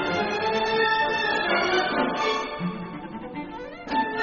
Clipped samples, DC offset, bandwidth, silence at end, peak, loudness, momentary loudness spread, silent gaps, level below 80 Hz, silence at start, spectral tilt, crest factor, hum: under 0.1%; under 0.1%; 7.2 kHz; 0 s; -10 dBFS; -24 LUFS; 14 LU; none; -54 dBFS; 0 s; -2 dB/octave; 16 dB; none